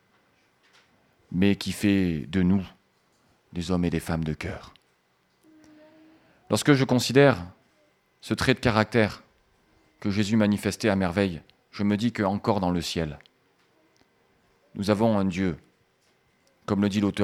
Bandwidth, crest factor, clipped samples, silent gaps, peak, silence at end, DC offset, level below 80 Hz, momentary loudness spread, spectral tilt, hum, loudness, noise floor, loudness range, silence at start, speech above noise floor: 15 kHz; 22 dB; under 0.1%; none; -4 dBFS; 0 s; under 0.1%; -52 dBFS; 18 LU; -6 dB/octave; none; -25 LUFS; -68 dBFS; 6 LU; 1.3 s; 44 dB